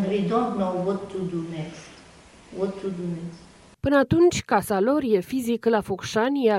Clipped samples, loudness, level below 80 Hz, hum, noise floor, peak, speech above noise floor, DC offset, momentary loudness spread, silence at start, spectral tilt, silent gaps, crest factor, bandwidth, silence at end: under 0.1%; -24 LUFS; -52 dBFS; none; -49 dBFS; -6 dBFS; 26 dB; under 0.1%; 15 LU; 0 s; -6 dB/octave; none; 18 dB; 16 kHz; 0 s